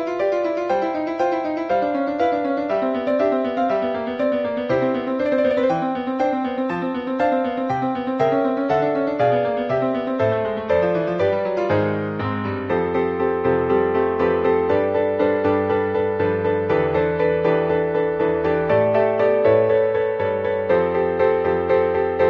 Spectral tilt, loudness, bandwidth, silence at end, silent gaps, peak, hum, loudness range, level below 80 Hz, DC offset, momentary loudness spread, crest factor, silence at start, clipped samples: -8 dB/octave; -20 LUFS; 6.6 kHz; 0 s; none; -6 dBFS; none; 3 LU; -46 dBFS; under 0.1%; 4 LU; 14 dB; 0 s; under 0.1%